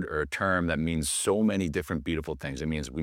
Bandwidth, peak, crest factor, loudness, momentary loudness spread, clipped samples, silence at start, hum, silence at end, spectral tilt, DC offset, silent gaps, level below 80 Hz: 16.5 kHz; -12 dBFS; 16 dB; -28 LUFS; 7 LU; under 0.1%; 0 s; none; 0 s; -4.5 dB/octave; under 0.1%; none; -44 dBFS